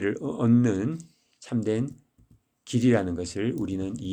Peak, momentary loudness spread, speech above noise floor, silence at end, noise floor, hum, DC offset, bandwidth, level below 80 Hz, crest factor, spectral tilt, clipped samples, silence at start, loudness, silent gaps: -10 dBFS; 10 LU; 35 dB; 0 s; -61 dBFS; none; under 0.1%; 9.6 kHz; -58 dBFS; 18 dB; -7 dB/octave; under 0.1%; 0 s; -26 LUFS; none